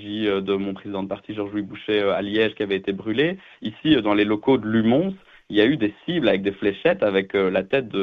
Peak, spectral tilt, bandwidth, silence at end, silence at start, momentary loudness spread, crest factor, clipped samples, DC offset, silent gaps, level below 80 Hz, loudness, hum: -4 dBFS; -8 dB/octave; 5.6 kHz; 0 s; 0 s; 10 LU; 18 dB; under 0.1%; under 0.1%; none; -56 dBFS; -22 LUFS; none